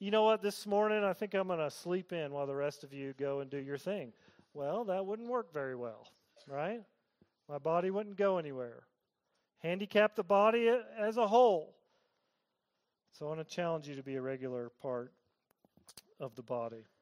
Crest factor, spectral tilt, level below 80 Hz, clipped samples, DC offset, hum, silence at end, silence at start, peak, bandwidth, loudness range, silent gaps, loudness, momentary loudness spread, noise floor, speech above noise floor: 20 dB; -5.5 dB/octave; -84 dBFS; under 0.1%; under 0.1%; none; 0.2 s; 0 s; -16 dBFS; 15.5 kHz; 10 LU; none; -35 LUFS; 16 LU; -86 dBFS; 51 dB